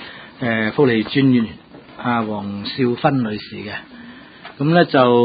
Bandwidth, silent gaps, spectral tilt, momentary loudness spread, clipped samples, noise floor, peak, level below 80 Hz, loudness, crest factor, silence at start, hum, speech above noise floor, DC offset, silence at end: 5 kHz; none; -12 dB/octave; 22 LU; under 0.1%; -39 dBFS; 0 dBFS; -54 dBFS; -18 LUFS; 18 dB; 0 s; none; 22 dB; under 0.1%; 0 s